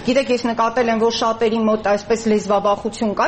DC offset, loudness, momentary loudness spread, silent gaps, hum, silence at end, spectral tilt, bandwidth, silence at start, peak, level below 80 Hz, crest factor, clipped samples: under 0.1%; -18 LUFS; 3 LU; none; none; 0 s; -4.5 dB/octave; 8.6 kHz; 0 s; -6 dBFS; -48 dBFS; 12 dB; under 0.1%